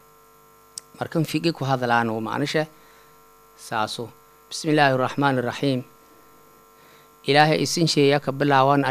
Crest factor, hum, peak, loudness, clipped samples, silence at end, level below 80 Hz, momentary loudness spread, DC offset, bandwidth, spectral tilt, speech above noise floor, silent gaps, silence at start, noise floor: 22 dB; none; 0 dBFS; -22 LUFS; under 0.1%; 0 s; -66 dBFS; 16 LU; under 0.1%; 15.5 kHz; -5 dB/octave; 32 dB; none; 1 s; -53 dBFS